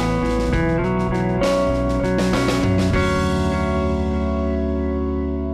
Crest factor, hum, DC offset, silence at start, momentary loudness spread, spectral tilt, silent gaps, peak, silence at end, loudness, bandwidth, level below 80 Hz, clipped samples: 10 dB; none; under 0.1%; 0 s; 4 LU; -6.5 dB/octave; none; -10 dBFS; 0 s; -20 LUFS; 13.5 kHz; -28 dBFS; under 0.1%